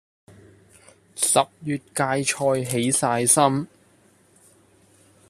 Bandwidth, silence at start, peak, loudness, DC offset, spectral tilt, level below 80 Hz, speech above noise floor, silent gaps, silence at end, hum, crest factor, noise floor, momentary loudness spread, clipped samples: 14.5 kHz; 1.15 s; -2 dBFS; -21 LUFS; under 0.1%; -3.5 dB/octave; -62 dBFS; 36 dB; none; 1.65 s; none; 22 dB; -58 dBFS; 12 LU; under 0.1%